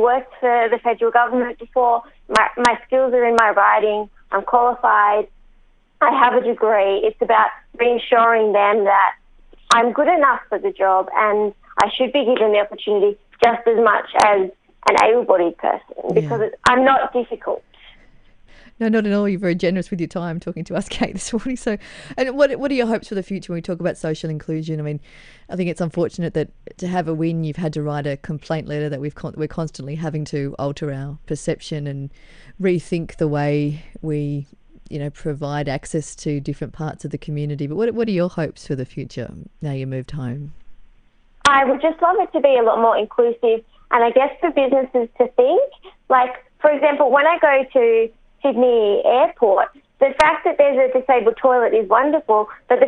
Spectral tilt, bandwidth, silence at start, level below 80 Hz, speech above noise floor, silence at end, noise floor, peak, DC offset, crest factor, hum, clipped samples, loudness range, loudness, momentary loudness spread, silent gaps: -5.5 dB/octave; 10.5 kHz; 0 s; -48 dBFS; 34 dB; 0 s; -52 dBFS; 0 dBFS; under 0.1%; 18 dB; none; under 0.1%; 9 LU; -18 LUFS; 13 LU; none